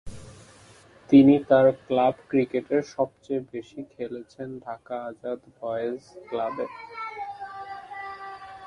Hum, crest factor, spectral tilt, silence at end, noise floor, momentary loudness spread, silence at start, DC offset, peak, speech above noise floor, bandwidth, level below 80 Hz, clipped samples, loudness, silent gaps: none; 20 dB; -7.5 dB/octave; 0 s; -53 dBFS; 20 LU; 0.05 s; under 0.1%; -6 dBFS; 28 dB; 7.2 kHz; -58 dBFS; under 0.1%; -24 LUFS; none